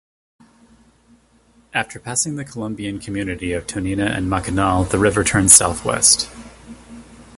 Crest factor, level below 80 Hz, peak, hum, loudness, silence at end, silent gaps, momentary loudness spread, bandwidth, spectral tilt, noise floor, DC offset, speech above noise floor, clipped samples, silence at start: 20 dB; -38 dBFS; 0 dBFS; none; -17 LUFS; 0.15 s; none; 17 LU; 16 kHz; -3 dB/octave; -55 dBFS; under 0.1%; 36 dB; under 0.1%; 1.75 s